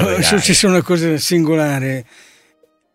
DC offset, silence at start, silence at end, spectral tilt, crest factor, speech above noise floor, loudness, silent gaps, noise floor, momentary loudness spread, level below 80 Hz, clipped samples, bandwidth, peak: under 0.1%; 0 s; 0.9 s; -4 dB/octave; 16 dB; 42 dB; -14 LUFS; none; -57 dBFS; 10 LU; -44 dBFS; under 0.1%; 16 kHz; 0 dBFS